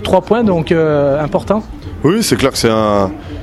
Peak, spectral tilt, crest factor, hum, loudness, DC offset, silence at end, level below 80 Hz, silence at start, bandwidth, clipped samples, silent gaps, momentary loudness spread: 0 dBFS; -5.5 dB/octave; 14 dB; none; -13 LUFS; under 0.1%; 0 s; -34 dBFS; 0 s; 13 kHz; under 0.1%; none; 6 LU